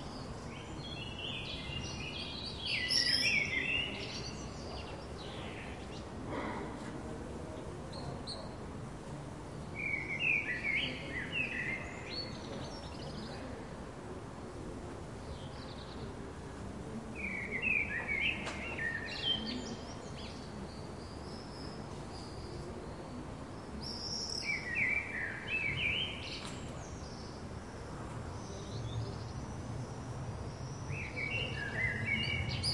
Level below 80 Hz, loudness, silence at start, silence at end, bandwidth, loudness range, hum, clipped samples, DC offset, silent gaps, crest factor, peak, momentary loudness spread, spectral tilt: -54 dBFS; -38 LUFS; 0 s; 0 s; 11.5 kHz; 12 LU; none; under 0.1%; under 0.1%; none; 22 dB; -18 dBFS; 14 LU; -4 dB/octave